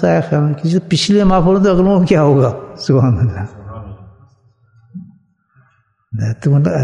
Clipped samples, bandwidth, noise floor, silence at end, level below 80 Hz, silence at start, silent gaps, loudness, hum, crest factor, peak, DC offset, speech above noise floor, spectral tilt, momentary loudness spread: under 0.1%; 10.5 kHz; -57 dBFS; 0 s; -36 dBFS; 0 s; none; -13 LUFS; none; 14 dB; 0 dBFS; under 0.1%; 45 dB; -7 dB/octave; 21 LU